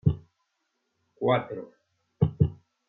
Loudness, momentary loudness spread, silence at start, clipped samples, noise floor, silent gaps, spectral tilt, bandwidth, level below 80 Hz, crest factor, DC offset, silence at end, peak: -27 LUFS; 15 LU; 0.05 s; under 0.1%; -78 dBFS; none; -10.5 dB/octave; 3.9 kHz; -50 dBFS; 20 dB; under 0.1%; 0.35 s; -8 dBFS